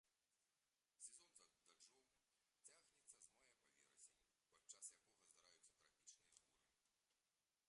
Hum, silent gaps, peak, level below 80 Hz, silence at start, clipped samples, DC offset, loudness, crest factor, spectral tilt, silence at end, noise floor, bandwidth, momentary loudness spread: none; none; -42 dBFS; under -90 dBFS; 0.05 s; under 0.1%; under 0.1%; -64 LUFS; 30 dB; 1.5 dB/octave; 0 s; under -90 dBFS; 11 kHz; 9 LU